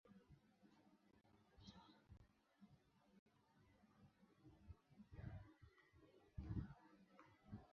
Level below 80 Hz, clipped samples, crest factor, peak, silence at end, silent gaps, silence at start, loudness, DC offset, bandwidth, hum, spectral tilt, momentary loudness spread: -68 dBFS; under 0.1%; 26 dB; -36 dBFS; 0 s; 3.19-3.26 s; 0.05 s; -59 LUFS; under 0.1%; 6.4 kHz; none; -7 dB/octave; 15 LU